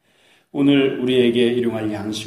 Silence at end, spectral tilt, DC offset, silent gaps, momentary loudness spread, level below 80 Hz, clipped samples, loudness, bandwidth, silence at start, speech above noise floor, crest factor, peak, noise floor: 0 s; -6 dB/octave; under 0.1%; none; 9 LU; -58 dBFS; under 0.1%; -18 LUFS; 13.5 kHz; 0.55 s; 39 dB; 14 dB; -4 dBFS; -57 dBFS